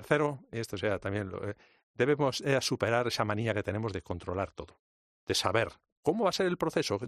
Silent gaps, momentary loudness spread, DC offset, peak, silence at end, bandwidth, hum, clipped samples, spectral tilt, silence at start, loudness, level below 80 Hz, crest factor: 1.83-1.94 s, 4.79-5.27 s, 5.92-6.03 s; 10 LU; under 0.1%; -10 dBFS; 0 s; 14 kHz; none; under 0.1%; -5 dB/octave; 0 s; -31 LUFS; -62 dBFS; 22 dB